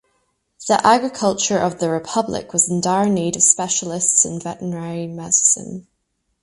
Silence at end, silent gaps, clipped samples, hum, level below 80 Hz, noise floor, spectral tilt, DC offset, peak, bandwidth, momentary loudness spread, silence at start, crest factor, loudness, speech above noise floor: 0.6 s; none; under 0.1%; none; -56 dBFS; -71 dBFS; -3 dB/octave; under 0.1%; 0 dBFS; 11.5 kHz; 13 LU; 0.6 s; 20 dB; -17 LUFS; 52 dB